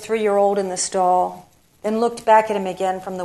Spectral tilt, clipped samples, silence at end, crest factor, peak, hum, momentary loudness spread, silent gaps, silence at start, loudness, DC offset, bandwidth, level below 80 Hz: -4 dB/octave; under 0.1%; 0 s; 18 dB; -2 dBFS; none; 9 LU; none; 0 s; -19 LUFS; under 0.1%; 13.5 kHz; -62 dBFS